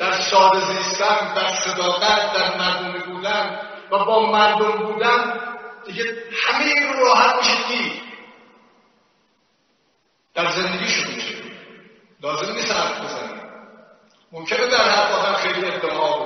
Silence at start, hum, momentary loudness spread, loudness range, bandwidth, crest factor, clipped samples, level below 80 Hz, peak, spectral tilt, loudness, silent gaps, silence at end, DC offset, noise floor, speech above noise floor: 0 s; none; 15 LU; 8 LU; 6.6 kHz; 20 dB; under 0.1%; -62 dBFS; 0 dBFS; 0 dB/octave; -19 LUFS; none; 0 s; under 0.1%; -65 dBFS; 46 dB